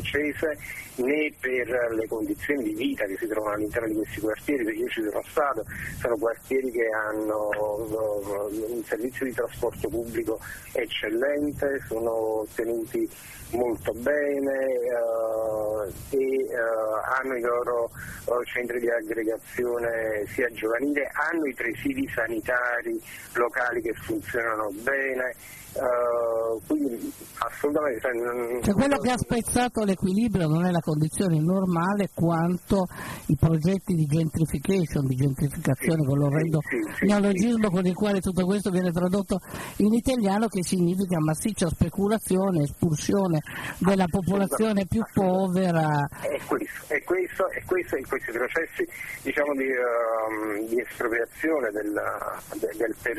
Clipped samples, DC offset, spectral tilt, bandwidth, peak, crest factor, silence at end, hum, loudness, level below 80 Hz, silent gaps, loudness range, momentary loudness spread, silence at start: under 0.1%; under 0.1%; -6 dB/octave; 13.5 kHz; -8 dBFS; 18 dB; 0 s; none; -26 LUFS; -50 dBFS; none; 4 LU; 7 LU; 0 s